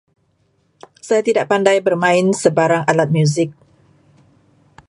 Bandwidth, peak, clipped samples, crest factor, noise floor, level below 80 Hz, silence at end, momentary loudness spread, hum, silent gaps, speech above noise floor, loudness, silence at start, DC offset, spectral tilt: 11.5 kHz; 0 dBFS; under 0.1%; 18 dB; -62 dBFS; -62 dBFS; 1.35 s; 4 LU; none; none; 47 dB; -15 LUFS; 1.05 s; under 0.1%; -5.5 dB/octave